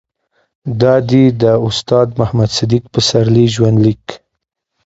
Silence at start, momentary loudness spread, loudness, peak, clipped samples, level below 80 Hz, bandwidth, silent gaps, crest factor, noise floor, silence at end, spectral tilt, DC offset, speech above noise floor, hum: 0.65 s; 7 LU; -12 LUFS; 0 dBFS; under 0.1%; -42 dBFS; 8 kHz; none; 12 dB; -62 dBFS; 0.7 s; -6.5 dB/octave; under 0.1%; 51 dB; none